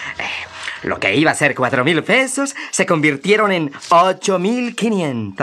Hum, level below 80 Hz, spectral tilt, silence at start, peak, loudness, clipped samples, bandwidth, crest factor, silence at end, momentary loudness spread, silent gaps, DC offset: none; -62 dBFS; -4 dB/octave; 0 s; 0 dBFS; -16 LUFS; under 0.1%; 13.5 kHz; 16 dB; 0 s; 10 LU; none; under 0.1%